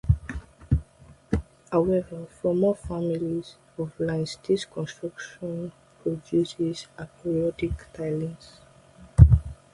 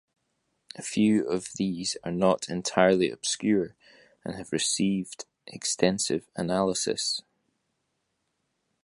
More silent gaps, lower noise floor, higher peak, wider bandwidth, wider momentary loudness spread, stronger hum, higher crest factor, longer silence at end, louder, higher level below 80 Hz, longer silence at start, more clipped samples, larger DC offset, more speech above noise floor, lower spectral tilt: neither; second, -53 dBFS vs -78 dBFS; first, 0 dBFS vs -4 dBFS; about the same, 11.5 kHz vs 11.5 kHz; about the same, 13 LU vs 15 LU; neither; about the same, 26 dB vs 24 dB; second, 0.2 s vs 1.65 s; about the same, -27 LUFS vs -27 LUFS; first, -32 dBFS vs -62 dBFS; second, 0.05 s vs 0.75 s; neither; neither; second, 25 dB vs 51 dB; first, -8 dB/octave vs -4 dB/octave